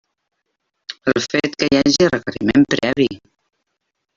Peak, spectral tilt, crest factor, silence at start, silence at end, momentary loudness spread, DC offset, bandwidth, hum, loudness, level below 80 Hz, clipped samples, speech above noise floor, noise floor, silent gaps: -2 dBFS; -4.5 dB/octave; 16 dB; 0.9 s; 1 s; 13 LU; under 0.1%; 7.6 kHz; none; -17 LUFS; -50 dBFS; under 0.1%; 58 dB; -75 dBFS; none